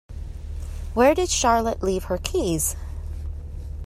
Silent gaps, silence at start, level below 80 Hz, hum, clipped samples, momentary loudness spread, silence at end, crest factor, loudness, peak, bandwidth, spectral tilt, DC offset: none; 0.1 s; -34 dBFS; none; under 0.1%; 17 LU; 0 s; 18 dB; -22 LUFS; -6 dBFS; 16 kHz; -4 dB/octave; under 0.1%